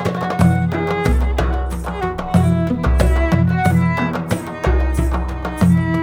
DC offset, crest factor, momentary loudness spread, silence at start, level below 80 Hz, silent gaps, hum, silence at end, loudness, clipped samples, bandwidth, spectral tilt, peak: under 0.1%; 16 dB; 7 LU; 0 s; -22 dBFS; none; none; 0 s; -18 LUFS; under 0.1%; 16 kHz; -7.5 dB/octave; 0 dBFS